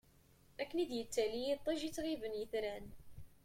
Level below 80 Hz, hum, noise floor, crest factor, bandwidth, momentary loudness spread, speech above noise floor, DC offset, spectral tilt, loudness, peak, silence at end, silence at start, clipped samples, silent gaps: -64 dBFS; none; -67 dBFS; 18 dB; 16.5 kHz; 19 LU; 28 dB; under 0.1%; -4 dB/octave; -40 LUFS; -24 dBFS; 0.1 s; 0.6 s; under 0.1%; none